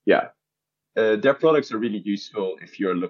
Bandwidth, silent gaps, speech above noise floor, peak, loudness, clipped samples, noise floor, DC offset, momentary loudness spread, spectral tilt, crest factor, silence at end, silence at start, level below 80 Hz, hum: 7 kHz; none; 63 dB; -4 dBFS; -23 LUFS; under 0.1%; -84 dBFS; under 0.1%; 11 LU; -6.5 dB/octave; 18 dB; 0 s; 0.05 s; -84 dBFS; none